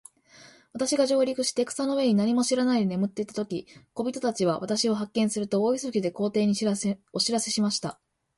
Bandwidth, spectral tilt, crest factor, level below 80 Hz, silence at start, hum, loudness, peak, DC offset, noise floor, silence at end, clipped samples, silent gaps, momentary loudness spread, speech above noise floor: 11.5 kHz; -4.5 dB/octave; 16 dB; -68 dBFS; 0.4 s; none; -26 LUFS; -10 dBFS; under 0.1%; -54 dBFS; 0.45 s; under 0.1%; none; 9 LU; 28 dB